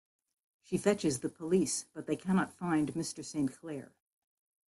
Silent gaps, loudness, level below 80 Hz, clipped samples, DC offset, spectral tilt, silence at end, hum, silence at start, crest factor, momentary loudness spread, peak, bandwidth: none; -33 LUFS; -70 dBFS; under 0.1%; under 0.1%; -5 dB/octave; 0.9 s; none; 0.7 s; 20 dB; 8 LU; -14 dBFS; 12.5 kHz